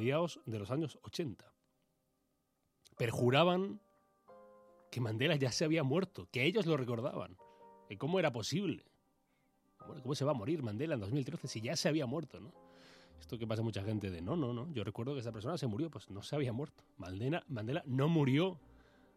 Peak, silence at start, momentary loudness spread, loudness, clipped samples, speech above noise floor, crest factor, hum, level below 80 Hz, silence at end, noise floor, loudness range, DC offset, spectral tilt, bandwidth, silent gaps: -14 dBFS; 0 s; 15 LU; -37 LUFS; under 0.1%; 44 dB; 24 dB; none; -72 dBFS; 0.6 s; -81 dBFS; 5 LU; under 0.1%; -6 dB/octave; 15 kHz; none